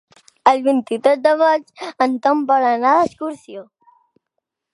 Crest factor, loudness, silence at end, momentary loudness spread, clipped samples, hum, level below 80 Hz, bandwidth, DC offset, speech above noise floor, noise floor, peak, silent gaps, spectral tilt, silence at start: 18 dB; -16 LUFS; 1.1 s; 16 LU; under 0.1%; none; -64 dBFS; 11.5 kHz; under 0.1%; 61 dB; -78 dBFS; 0 dBFS; none; -4.5 dB/octave; 0.45 s